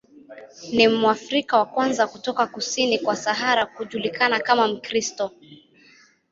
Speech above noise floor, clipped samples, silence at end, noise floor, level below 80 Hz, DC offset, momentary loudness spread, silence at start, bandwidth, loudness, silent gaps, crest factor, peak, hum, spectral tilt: 32 dB; under 0.1%; 0.75 s; -55 dBFS; -66 dBFS; under 0.1%; 9 LU; 0.3 s; 7.8 kHz; -22 LUFS; none; 20 dB; -2 dBFS; none; -2.5 dB/octave